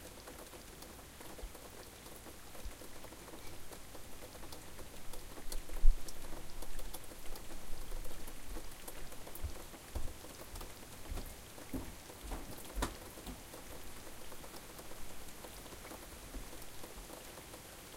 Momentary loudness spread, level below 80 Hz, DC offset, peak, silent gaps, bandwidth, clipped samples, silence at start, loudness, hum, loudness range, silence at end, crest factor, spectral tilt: 5 LU; -42 dBFS; under 0.1%; -12 dBFS; none; 16.5 kHz; under 0.1%; 0 s; -48 LUFS; none; 6 LU; 0 s; 26 dB; -3.5 dB/octave